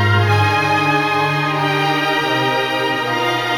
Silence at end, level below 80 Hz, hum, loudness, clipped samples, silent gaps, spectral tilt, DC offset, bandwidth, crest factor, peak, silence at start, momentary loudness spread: 0 s; -52 dBFS; none; -16 LUFS; under 0.1%; none; -5 dB/octave; under 0.1%; 17 kHz; 14 dB; -2 dBFS; 0 s; 3 LU